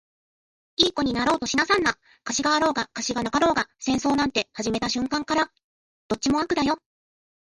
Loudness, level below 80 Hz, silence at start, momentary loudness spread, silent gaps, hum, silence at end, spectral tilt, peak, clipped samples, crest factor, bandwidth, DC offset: -24 LUFS; -52 dBFS; 0.8 s; 6 LU; 5.64-6.09 s; none; 0.7 s; -3 dB/octave; -4 dBFS; under 0.1%; 20 dB; 11.5 kHz; under 0.1%